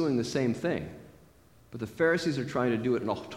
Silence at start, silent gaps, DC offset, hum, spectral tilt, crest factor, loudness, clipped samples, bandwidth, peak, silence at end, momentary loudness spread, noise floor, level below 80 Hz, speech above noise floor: 0 s; none; under 0.1%; none; -6 dB/octave; 16 dB; -30 LUFS; under 0.1%; 16.5 kHz; -14 dBFS; 0 s; 16 LU; -59 dBFS; -60 dBFS; 29 dB